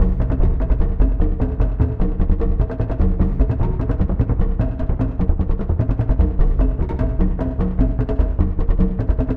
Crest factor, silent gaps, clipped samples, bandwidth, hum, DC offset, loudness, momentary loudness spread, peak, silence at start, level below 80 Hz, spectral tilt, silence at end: 14 dB; none; under 0.1%; 3.2 kHz; none; under 0.1%; -21 LUFS; 3 LU; -2 dBFS; 0 s; -18 dBFS; -11.5 dB/octave; 0 s